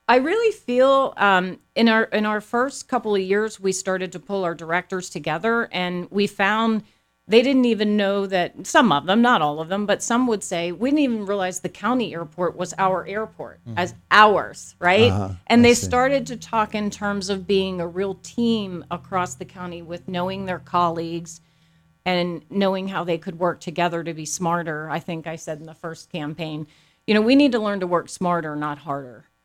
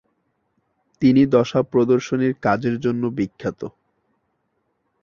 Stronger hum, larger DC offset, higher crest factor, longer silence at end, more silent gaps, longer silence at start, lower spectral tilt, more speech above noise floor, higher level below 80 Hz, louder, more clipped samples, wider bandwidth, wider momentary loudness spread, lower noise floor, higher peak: neither; neither; about the same, 22 dB vs 18 dB; second, 0.25 s vs 1.35 s; neither; second, 0.1 s vs 1 s; second, -4.5 dB/octave vs -7.5 dB/octave; second, 38 dB vs 52 dB; about the same, -56 dBFS vs -56 dBFS; about the same, -21 LUFS vs -20 LUFS; neither; first, 14.5 kHz vs 7.2 kHz; about the same, 14 LU vs 13 LU; second, -59 dBFS vs -71 dBFS; first, 0 dBFS vs -4 dBFS